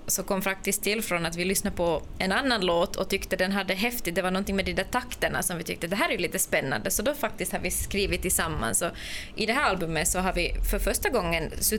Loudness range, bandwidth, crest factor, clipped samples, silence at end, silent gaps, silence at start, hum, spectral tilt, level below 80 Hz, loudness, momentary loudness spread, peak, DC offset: 1 LU; over 20 kHz; 16 dB; under 0.1%; 0 s; none; 0 s; none; -3 dB/octave; -38 dBFS; -27 LUFS; 4 LU; -12 dBFS; under 0.1%